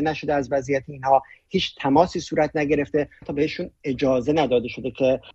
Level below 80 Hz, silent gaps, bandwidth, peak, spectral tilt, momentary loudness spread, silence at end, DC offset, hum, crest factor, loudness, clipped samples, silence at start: -50 dBFS; none; 8 kHz; -4 dBFS; -6 dB/octave; 7 LU; 0.05 s; under 0.1%; none; 20 dB; -23 LUFS; under 0.1%; 0 s